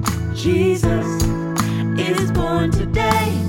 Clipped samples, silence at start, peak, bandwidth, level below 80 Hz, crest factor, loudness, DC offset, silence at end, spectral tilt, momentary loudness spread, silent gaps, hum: under 0.1%; 0 s; -2 dBFS; 18 kHz; -30 dBFS; 16 dB; -19 LUFS; under 0.1%; 0 s; -6 dB/octave; 4 LU; none; none